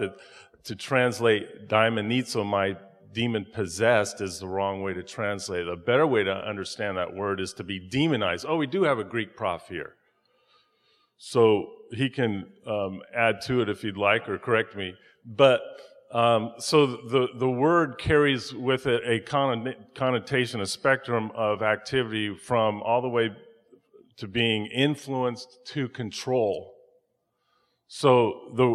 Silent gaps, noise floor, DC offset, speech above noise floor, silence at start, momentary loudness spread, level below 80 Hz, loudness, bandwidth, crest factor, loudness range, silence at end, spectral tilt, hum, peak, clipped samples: none; -75 dBFS; under 0.1%; 49 dB; 0 s; 11 LU; -58 dBFS; -26 LUFS; 12.5 kHz; 22 dB; 5 LU; 0 s; -5 dB/octave; none; -4 dBFS; under 0.1%